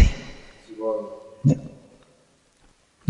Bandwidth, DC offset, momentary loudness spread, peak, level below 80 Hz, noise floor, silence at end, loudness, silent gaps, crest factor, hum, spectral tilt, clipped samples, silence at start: 9.8 kHz; under 0.1%; 21 LU; -2 dBFS; -32 dBFS; -60 dBFS; 1.4 s; -26 LUFS; none; 22 dB; none; -7.5 dB/octave; under 0.1%; 0 s